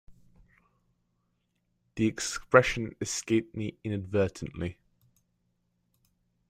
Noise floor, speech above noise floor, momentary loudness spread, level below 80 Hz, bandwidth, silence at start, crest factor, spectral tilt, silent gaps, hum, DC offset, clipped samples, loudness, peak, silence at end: -76 dBFS; 48 dB; 15 LU; -56 dBFS; 15 kHz; 0.1 s; 28 dB; -5 dB/octave; none; none; under 0.1%; under 0.1%; -29 LUFS; -4 dBFS; 1.75 s